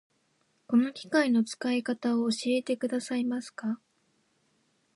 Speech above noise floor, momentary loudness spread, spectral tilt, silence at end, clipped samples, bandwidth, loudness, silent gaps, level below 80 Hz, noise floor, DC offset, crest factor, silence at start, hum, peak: 44 dB; 9 LU; -4.5 dB/octave; 1.2 s; under 0.1%; 11.5 kHz; -29 LUFS; none; -82 dBFS; -72 dBFS; under 0.1%; 18 dB; 0.7 s; none; -12 dBFS